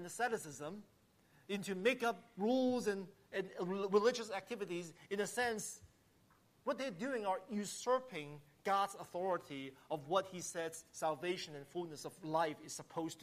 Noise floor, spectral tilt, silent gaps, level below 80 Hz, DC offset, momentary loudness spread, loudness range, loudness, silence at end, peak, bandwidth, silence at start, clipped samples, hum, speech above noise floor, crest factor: -71 dBFS; -4 dB/octave; none; -80 dBFS; under 0.1%; 12 LU; 4 LU; -40 LUFS; 0 s; -22 dBFS; 15 kHz; 0 s; under 0.1%; none; 31 dB; 20 dB